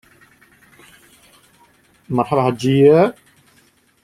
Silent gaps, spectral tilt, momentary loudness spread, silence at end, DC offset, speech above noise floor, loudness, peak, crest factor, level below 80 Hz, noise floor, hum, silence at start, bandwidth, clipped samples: none; -7.5 dB/octave; 10 LU; 0.9 s; under 0.1%; 42 dB; -15 LUFS; -2 dBFS; 18 dB; -58 dBFS; -56 dBFS; none; 2.1 s; 13.5 kHz; under 0.1%